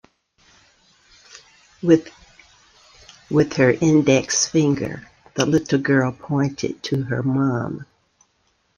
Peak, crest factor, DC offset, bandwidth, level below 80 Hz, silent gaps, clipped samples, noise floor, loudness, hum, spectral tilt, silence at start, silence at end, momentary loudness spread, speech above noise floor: -2 dBFS; 20 dB; under 0.1%; 10.5 kHz; -56 dBFS; none; under 0.1%; -66 dBFS; -20 LUFS; none; -5 dB/octave; 1.35 s; 0.95 s; 11 LU; 47 dB